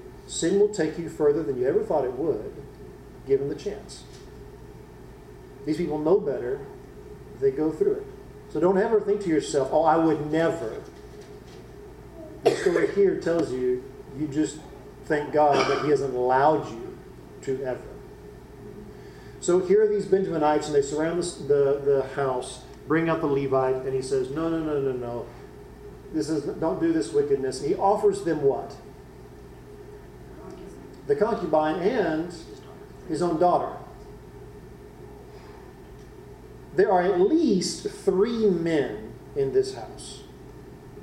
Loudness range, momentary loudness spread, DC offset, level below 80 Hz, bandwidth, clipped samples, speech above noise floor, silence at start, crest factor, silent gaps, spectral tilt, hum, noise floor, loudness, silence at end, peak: 6 LU; 23 LU; under 0.1%; -52 dBFS; 12 kHz; under 0.1%; 21 dB; 0 s; 20 dB; none; -6 dB/octave; none; -45 dBFS; -25 LUFS; 0 s; -6 dBFS